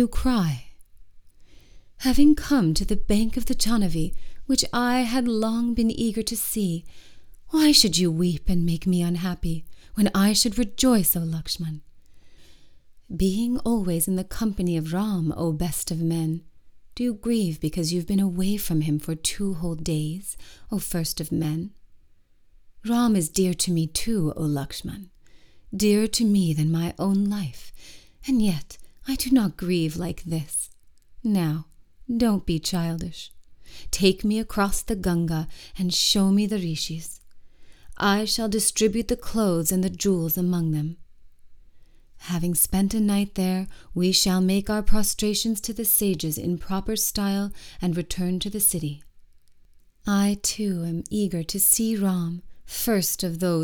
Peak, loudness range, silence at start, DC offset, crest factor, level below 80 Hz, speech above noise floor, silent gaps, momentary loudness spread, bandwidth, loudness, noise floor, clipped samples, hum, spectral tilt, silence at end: -2 dBFS; 4 LU; 0 s; under 0.1%; 22 dB; -38 dBFS; 31 dB; none; 12 LU; over 20 kHz; -24 LUFS; -54 dBFS; under 0.1%; none; -4.5 dB/octave; 0 s